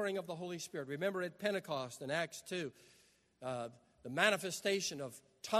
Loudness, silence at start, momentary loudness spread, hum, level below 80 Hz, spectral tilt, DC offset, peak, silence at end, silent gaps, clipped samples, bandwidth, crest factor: -39 LUFS; 0 s; 15 LU; none; -82 dBFS; -3.5 dB/octave; under 0.1%; -14 dBFS; 0 s; none; under 0.1%; 13.5 kHz; 24 dB